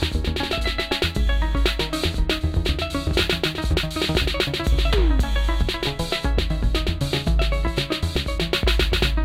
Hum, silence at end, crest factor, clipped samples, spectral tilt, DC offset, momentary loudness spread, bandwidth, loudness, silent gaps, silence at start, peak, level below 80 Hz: none; 0 s; 16 dB; under 0.1%; -5 dB/octave; under 0.1%; 4 LU; 15.5 kHz; -23 LUFS; none; 0 s; -6 dBFS; -24 dBFS